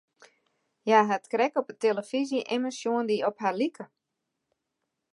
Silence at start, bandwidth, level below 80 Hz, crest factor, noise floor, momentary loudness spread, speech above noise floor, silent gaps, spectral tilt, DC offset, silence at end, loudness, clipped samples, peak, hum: 0.85 s; 11.5 kHz; -86 dBFS; 22 dB; -83 dBFS; 9 LU; 56 dB; none; -4.5 dB/octave; under 0.1%; 1.25 s; -27 LUFS; under 0.1%; -6 dBFS; none